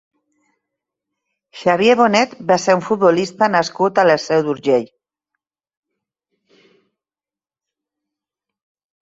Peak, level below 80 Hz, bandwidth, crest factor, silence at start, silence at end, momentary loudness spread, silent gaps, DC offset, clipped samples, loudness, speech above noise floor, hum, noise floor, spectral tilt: -2 dBFS; -64 dBFS; 8 kHz; 18 dB; 1.55 s; 4.15 s; 5 LU; none; under 0.1%; under 0.1%; -16 LUFS; over 75 dB; none; under -90 dBFS; -5 dB/octave